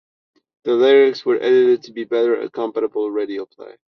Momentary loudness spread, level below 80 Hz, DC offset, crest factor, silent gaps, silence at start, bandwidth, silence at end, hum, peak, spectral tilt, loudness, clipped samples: 14 LU; -68 dBFS; under 0.1%; 14 dB; none; 0.65 s; 6.2 kHz; 0.25 s; none; -4 dBFS; -5.5 dB/octave; -17 LUFS; under 0.1%